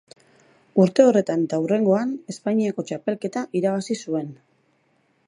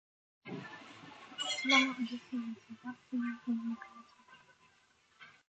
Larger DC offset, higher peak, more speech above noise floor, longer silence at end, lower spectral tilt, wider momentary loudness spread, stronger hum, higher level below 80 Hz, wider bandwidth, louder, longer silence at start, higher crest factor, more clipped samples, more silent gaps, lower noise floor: neither; first, -2 dBFS vs -14 dBFS; first, 44 dB vs 34 dB; first, 0.95 s vs 0.2 s; first, -7 dB/octave vs -2.5 dB/octave; second, 12 LU vs 24 LU; neither; first, -74 dBFS vs -84 dBFS; first, 11 kHz vs 8.8 kHz; first, -22 LUFS vs -35 LUFS; first, 0.75 s vs 0.45 s; about the same, 20 dB vs 24 dB; neither; neither; second, -65 dBFS vs -70 dBFS